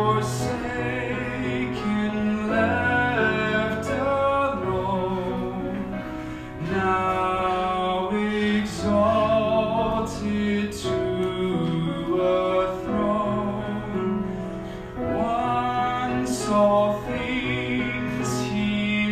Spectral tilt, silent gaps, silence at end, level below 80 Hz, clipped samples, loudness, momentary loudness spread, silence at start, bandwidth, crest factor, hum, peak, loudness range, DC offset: -6 dB/octave; none; 0 s; -44 dBFS; under 0.1%; -24 LUFS; 7 LU; 0 s; 14.5 kHz; 16 dB; none; -8 dBFS; 3 LU; under 0.1%